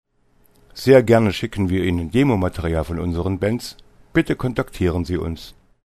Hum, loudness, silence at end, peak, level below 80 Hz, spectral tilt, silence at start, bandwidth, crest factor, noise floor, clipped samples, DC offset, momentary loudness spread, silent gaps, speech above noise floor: none; -20 LUFS; 0.35 s; 0 dBFS; -38 dBFS; -7 dB/octave; 0.75 s; 13.5 kHz; 20 dB; -58 dBFS; under 0.1%; under 0.1%; 12 LU; none; 39 dB